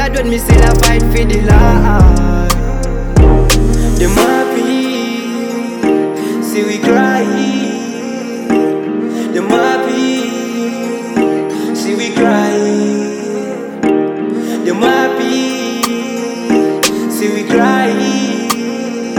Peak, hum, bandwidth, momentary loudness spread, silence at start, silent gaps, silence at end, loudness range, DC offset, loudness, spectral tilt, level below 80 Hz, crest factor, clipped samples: 0 dBFS; none; 19.5 kHz; 9 LU; 0 s; none; 0 s; 4 LU; under 0.1%; -13 LUFS; -5.5 dB/octave; -18 dBFS; 12 dB; 0.4%